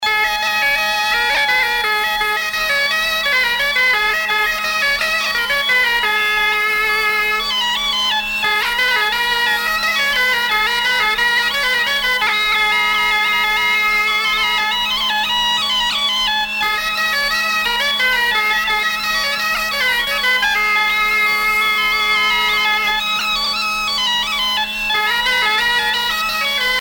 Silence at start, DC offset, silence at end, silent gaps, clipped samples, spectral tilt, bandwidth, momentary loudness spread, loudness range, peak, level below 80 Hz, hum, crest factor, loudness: 0 s; under 0.1%; 0 s; none; under 0.1%; 0.5 dB/octave; 17.5 kHz; 3 LU; 1 LU; -4 dBFS; -44 dBFS; none; 12 dB; -15 LUFS